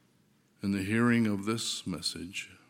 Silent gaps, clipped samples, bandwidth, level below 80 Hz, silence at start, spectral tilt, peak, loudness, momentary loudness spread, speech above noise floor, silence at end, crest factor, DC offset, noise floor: none; under 0.1%; 16 kHz; -68 dBFS; 0.65 s; -4.5 dB/octave; -14 dBFS; -31 LUFS; 12 LU; 37 dB; 0.15 s; 18 dB; under 0.1%; -67 dBFS